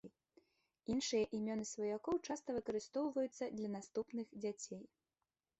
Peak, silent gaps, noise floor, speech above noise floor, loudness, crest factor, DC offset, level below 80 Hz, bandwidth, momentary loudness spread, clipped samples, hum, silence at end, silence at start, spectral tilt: -26 dBFS; none; under -90 dBFS; over 48 dB; -42 LUFS; 16 dB; under 0.1%; -74 dBFS; 8.2 kHz; 10 LU; under 0.1%; none; 0.75 s; 0.05 s; -4.5 dB/octave